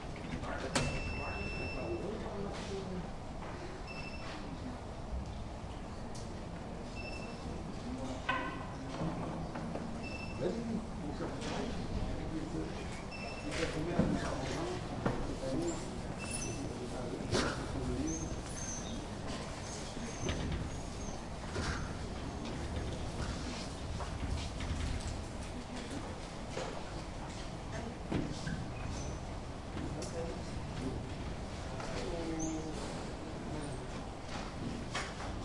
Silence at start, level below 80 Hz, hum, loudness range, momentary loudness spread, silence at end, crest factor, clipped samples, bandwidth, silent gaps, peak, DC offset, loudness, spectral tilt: 0 s; -46 dBFS; none; 5 LU; 7 LU; 0 s; 22 dB; under 0.1%; 11.5 kHz; none; -18 dBFS; under 0.1%; -40 LUFS; -5 dB/octave